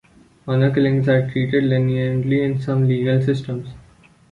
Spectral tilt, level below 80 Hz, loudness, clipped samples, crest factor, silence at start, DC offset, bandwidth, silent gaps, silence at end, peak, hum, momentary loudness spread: -9 dB/octave; -50 dBFS; -19 LUFS; under 0.1%; 14 dB; 0.45 s; under 0.1%; 6.8 kHz; none; 0.5 s; -4 dBFS; none; 10 LU